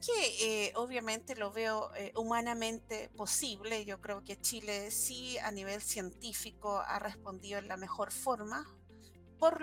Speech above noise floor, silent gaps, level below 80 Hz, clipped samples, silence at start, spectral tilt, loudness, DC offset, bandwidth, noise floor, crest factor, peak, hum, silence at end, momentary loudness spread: 20 dB; none; -64 dBFS; under 0.1%; 0 s; -1.5 dB/octave; -37 LUFS; under 0.1%; 18 kHz; -58 dBFS; 22 dB; -16 dBFS; none; 0 s; 10 LU